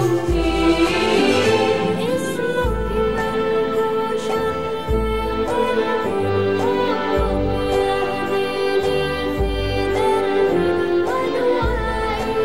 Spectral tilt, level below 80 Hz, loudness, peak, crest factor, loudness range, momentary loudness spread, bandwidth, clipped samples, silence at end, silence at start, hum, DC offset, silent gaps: -5.5 dB/octave; -30 dBFS; -19 LUFS; -4 dBFS; 14 dB; 2 LU; 5 LU; 16 kHz; under 0.1%; 0 s; 0 s; none; 1%; none